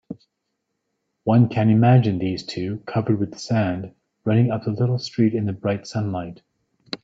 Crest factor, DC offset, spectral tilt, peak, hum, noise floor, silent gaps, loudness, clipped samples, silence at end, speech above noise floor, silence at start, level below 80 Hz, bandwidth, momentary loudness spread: 18 dB; under 0.1%; -8 dB/octave; -4 dBFS; none; -77 dBFS; none; -21 LUFS; under 0.1%; 0.05 s; 57 dB; 0.1 s; -58 dBFS; 7.8 kHz; 14 LU